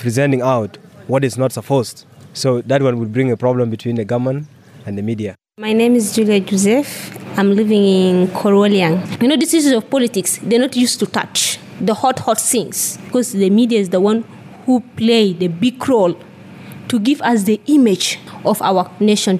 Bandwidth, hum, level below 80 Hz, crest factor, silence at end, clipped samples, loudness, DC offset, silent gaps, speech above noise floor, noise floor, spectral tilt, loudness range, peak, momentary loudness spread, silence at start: 15.5 kHz; none; -68 dBFS; 12 dB; 0 s; under 0.1%; -15 LUFS; under 0.1%; none; 21 dB; -35 dBFS; -5 dB/octave; 4 LU; -4 dBFS; 11 LU; 0 s